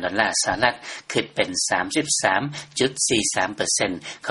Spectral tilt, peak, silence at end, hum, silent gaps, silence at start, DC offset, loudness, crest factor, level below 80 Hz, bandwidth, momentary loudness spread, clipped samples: -2 dB/octave; -2 dBFS; 0 s; none; none; 0 s; under 0.1%; -22 LUFS; 22 dB; -56 dBFS; 11.5 kHz; 7 LU; under 0.1%